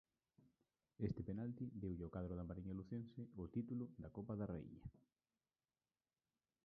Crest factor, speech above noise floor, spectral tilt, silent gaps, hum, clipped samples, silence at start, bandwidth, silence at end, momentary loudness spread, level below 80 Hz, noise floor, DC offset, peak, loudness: 22 dB; over 41 dB; -10.5 dB/octave; none; none; under 0.1%; 0.4 s; 4.5 kHz; 1.65 s; 7 LU; -66 dBFS; under -90 dBFS; under 0.1%; -30 dBFS; -50 LUFS